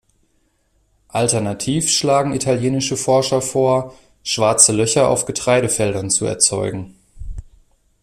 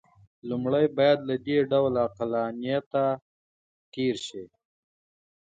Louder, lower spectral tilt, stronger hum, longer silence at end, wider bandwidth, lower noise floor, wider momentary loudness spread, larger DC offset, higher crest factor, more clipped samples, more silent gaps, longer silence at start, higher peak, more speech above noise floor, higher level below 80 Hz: first, -16 LUFS vs -26 LUFS; second, -3.5 dB/octave vs -6.5 dB/octave; neither; second, 0.6 s vs 1.05 s; first, 15.5 kHz vs 9 kHz; second, -63 dBFS vs under -90 dBFS; first, 19 LU vs 13 LU; neither; about the same, 18 dB vs 18 dB; neither; second, none vs 2.86-2.91 s, 3.22-3.92 s; first, 1.15 s vs 0.45 s; first, 0 dBFS vs -10 dBFS; second, 46 dB vs over 64 dB; first, -42 dBFS vs -66 dBFS